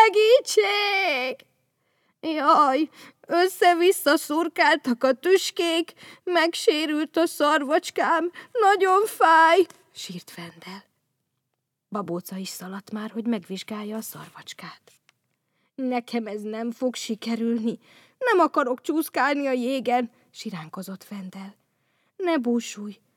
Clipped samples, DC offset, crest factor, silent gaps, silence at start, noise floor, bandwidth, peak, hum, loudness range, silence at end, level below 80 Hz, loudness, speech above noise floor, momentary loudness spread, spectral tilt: under 0.1%; under 0.1%; 22 dB; none; 0 s; -80 dBFS; 18 kHz; -2 dBFS; none; 13 LU; 0.25 s; -88 dBFS; -22 LUFS; 57 dB; 19 LU; -3.5 dB/octave